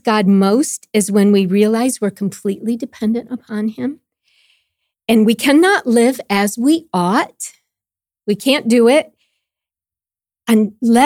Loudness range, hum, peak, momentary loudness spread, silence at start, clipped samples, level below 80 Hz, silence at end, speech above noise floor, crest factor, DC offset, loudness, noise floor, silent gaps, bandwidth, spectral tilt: 5 LU; none; 0 dBFS; 13 LU; 0.05 s; under 0.1%; -62 dBFS; 0 s; over 76 dB; 14 dB; under 0.1%; -15 LUFS; under -90 dBFS; none; 16.5 kHz; -5 dB/octave